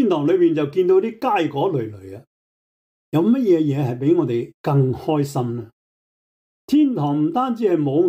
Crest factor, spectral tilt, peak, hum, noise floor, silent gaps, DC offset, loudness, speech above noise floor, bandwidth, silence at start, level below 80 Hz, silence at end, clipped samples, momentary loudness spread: 12 dB; -8.5 dB/octave; -6 dBFS; none; under -90 dBFS; 2.27-3.12 s, 4.54-4.64 s, 5.73-6.68 s; under 0.1%; -19 LUFS; over 72 dB; 15.5 kHz; 0 s; -64 dBFS; 0 s; under 0.1%; 8 LU